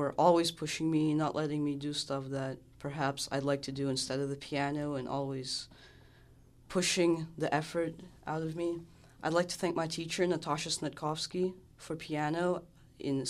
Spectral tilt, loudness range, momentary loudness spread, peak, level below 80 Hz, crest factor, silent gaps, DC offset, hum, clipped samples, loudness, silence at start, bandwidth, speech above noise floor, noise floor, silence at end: -4.5 dB/octave; 2 LU; 10 LU; -12 dBFS; -64 dBFS; 22 dB; none; under 0.1%; none; under 0.1%; -34 LUFS; 0 s; 14 kHz; 26 dB; -59 dBFS; 0 s